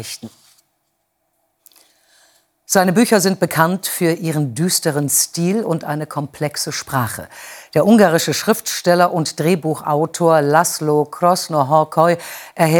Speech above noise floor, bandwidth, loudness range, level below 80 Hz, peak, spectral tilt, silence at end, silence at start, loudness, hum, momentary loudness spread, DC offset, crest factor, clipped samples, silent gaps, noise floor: 52 dB; over 20 kHz; 4 LU; -62 dBFS; 0 dBFS; -4.5 dB/octave; 0 s; 0 s; -16 LUFS; none; 10 LU; under 0.1%; 18 dB; under 0.1%; none; -69 dBFS